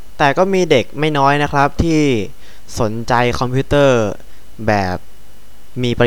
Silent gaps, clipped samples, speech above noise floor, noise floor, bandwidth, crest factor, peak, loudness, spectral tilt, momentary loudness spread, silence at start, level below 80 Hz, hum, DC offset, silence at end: none; under 0.1%; 29 dB; -44 dBFS; 19.5 kHz; 16 dB; 0 dBFS; -15 LUFS; -6 dB/octave; 11 LU; 0.1 s; -34 dBFS; none; 6%; 0 s